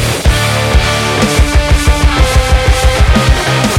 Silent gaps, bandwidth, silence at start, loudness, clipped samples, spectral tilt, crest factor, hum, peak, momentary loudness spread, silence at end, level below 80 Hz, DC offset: none; 16 kHz; 0 s; -10 LUFS; 0.5%; -4.5 dB/octave; 8 dB; none; 0 dBFS; 2 LU; 0 s; -12 dBFS; under 0.1%